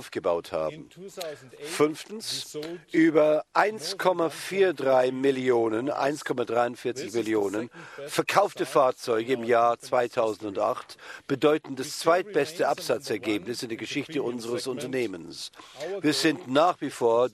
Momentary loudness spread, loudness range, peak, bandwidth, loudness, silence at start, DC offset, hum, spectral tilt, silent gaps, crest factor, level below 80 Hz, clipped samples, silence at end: 13 LU; 5 LU; -6 dBFS; 14 kHz; -26 LUFS; 0 s; under 0.1%; none; -4.5 dB/octave; none; 20 dB; -72 dBFS; under 0.1%; 0.05 s